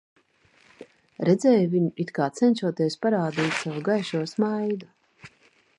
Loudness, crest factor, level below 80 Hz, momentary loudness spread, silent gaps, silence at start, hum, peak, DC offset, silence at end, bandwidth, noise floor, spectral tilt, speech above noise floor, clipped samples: -24 LUFS; 18 dB; -72 dBFS; 8 LU; none; 1.2 s; none; -8 dBFS; under 0.1%; 0.5 s; 11 kHz; -61 dBFS; -6.5 dB/octave; 38 dB; under 0.1%